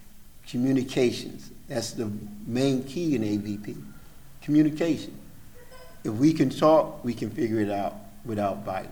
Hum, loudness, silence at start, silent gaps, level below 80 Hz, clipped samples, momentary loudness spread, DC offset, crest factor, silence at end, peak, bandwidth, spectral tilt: none; -26 LUFS; 0 s; none; -52 dBFS; under 0.1%; 16 LU; under 0.1%; 20 dB; 0 s; -6 dBFS; over 20 kHz; -6.5 dB/octave